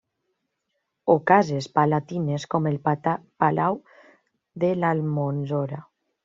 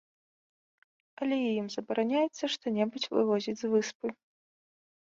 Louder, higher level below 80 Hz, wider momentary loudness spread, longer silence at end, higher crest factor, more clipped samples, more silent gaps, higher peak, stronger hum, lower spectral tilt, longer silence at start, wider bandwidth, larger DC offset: first, -24 LUFS vs -31 LUFS; first, -66 dBFS vs -80 dBFS; about the same, 9 LU vs 8 LU; second, 0.45 s vs 1 s; about the same, 22 dB vs 18 dB; neither; second, none vs 3.95-4.00 s; first, -2 dBFS vs -14 dBFS; neither; first, -6.5 dB/octave vs -4.5 dB/octave; second, 1.05 s vs 1.2 s; about the same, 7.6 kHz vs 7.8 kHz; neither